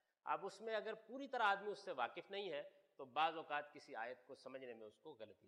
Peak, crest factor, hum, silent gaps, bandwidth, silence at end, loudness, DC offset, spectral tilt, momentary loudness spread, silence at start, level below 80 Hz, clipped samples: -26 dBFS; 22 dB; none; none; 11 kHz; 0.15 s; -45 LUFS; under 0.1%; -3.5 dB/octave; 18 LU; 0.25 s; under -90 dBFS; under 0.1%